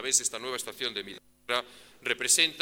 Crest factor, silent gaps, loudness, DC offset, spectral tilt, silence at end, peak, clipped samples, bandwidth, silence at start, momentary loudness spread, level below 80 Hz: 22 dB; none; -28 LUFS; under 0.1%; 1 dB/octave; 0 s; -10 dBFS; under 0.1%; over 20 kHz; 0 s; 20 LU; -72 dBFS